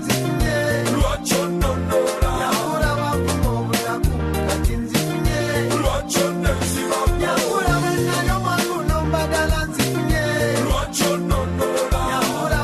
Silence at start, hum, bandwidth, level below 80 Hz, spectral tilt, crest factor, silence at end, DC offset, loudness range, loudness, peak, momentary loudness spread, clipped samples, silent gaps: 0 s; none; 13 kHz; -28 dBFS; -4.5 dB/octave; 12 dB; 0 s; under 0.1%; 1 LU; -20 LUFS; -6 dBFS; 2 LU; under 0.1%; none